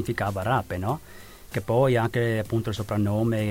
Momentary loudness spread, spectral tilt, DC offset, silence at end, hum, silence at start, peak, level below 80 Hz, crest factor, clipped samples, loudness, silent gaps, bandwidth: 11 LU; -7 dB/octave; under 0.1%; 0 s; none; 0 s; -10 dBFS; -50 dBFS; 14 dB; under 0.1%; -26 LUFS; none; 17 kHz